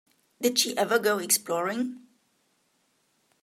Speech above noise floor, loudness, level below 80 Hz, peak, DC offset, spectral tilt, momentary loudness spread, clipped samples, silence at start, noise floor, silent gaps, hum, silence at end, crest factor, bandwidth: 44 dB; -26 LUFS; -80 dBFS; -6 dBFS; under 0.1%; -1.5 dB/octave; 9 LU; under 0.1%; 0.4 s; -71 dBFS; none; none; 1.45 s; 24 dB; 16 kHz